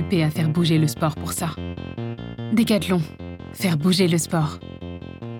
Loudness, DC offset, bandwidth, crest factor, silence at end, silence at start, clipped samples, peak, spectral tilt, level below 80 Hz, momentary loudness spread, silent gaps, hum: -22 LUFS; under 0.1%; 19 kHz; 16 dB; 0 s; 0 s; under 0.1%; -6 dBFS; -5.5 dB/octave; -52 dBFS; 16 LU; none; none